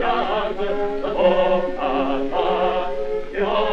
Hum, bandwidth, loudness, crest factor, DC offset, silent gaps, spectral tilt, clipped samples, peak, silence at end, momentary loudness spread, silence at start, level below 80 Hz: none; 6.6 kHz; -21 LUFS; 16 dB; under 0.1%; none; -6.5 dB/octave; under 0.1%; -4 dBFS; 0 s; 6 LU; 0 s; -36 dBFS